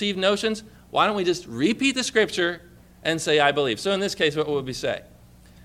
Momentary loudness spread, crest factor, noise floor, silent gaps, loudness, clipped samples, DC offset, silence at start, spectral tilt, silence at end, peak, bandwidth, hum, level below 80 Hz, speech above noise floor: 9 LU; 20 dB; -50 dBFS; none; -23 LUFS; under 0.1%; under 0.1%; 0 s; -3.5 dB/octave; 0.6 s; -4 dBFS; 15 kHz; 60 Hz at -50 dBFS; -56 dBFS; 26 dB